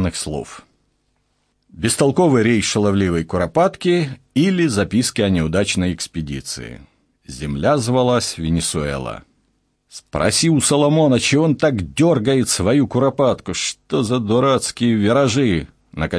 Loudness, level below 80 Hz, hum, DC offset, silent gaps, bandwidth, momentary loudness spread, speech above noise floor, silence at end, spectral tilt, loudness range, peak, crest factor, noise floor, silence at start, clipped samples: -17 LUFS; -42 dBFS; none; under 0.1%; none; 11 kHz; 12 LU; 49 dB; 0 s; -5 dB/octave; 5 LU; -2 dBFS; 16 dB; -66 dBFS; 0 s; under 0.1%